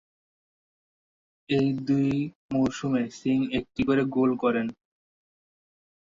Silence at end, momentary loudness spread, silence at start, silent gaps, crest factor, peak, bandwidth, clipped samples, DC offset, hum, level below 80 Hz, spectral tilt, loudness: 1.3 s; 6 LU; 1.5 s; 2.35-2.49 s; 16 dB; -12 dBFS; 7.6 kHz; under 0.1%; under 0.1%; none; -58 dBFS; -7 dB/octave; -26 LUFS